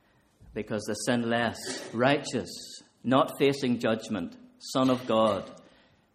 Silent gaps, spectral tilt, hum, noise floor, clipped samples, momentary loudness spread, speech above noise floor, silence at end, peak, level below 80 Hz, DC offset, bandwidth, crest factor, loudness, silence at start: none; -5 dB/octave; none; -60 dBFS; under 0.1%; 15 LU; 32 dB; 0.55 s; -8 dBFS; -64 dBFS; under 0.1%; 15 kHz; 22 dB; -28 LUFS; 0.45 s